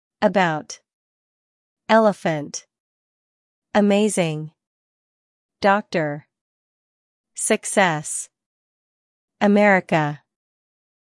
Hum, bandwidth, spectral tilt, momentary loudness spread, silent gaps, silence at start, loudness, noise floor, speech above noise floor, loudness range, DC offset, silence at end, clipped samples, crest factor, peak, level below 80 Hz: none; 12 kHz; -4.5 dB/octave; 21 LU; 0.93-1.77 s, 2.80-3.62 s, 4.67-5.49 s, 6.41-7.24 s, 8.46-9.28 s; 0.2 s; -20 LUFS; under -90 dBFS; over 71 dB; 4 LU; under 0.1%; 1 s; under 0.1%; 20 dB; -2 dBFS; -70 dBFS